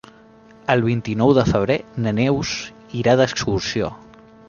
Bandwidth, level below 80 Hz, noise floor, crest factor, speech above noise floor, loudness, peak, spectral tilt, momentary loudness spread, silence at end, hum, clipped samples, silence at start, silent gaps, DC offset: 7.2 kHz; -44 dBFS; -47 dBFS; 18 dB; 29 dB; -20 LUFS; -2 dBFS; -6 dB/octave; 11 LU; 0.5 s; none; under 0.1%; 0.7 s; none; under 0.1%